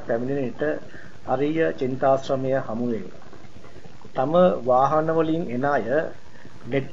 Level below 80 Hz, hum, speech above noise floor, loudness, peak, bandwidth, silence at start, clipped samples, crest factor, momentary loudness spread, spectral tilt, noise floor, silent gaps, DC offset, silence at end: -56 dBFS; none; 23 dB; -23 LUFS; -6 dBFS; 7.6 kHz; 0 s; under 0.1%; 18 dB; 14 LU; -7.5 dB/octave; -45 dBFS; none; 2%; 0 s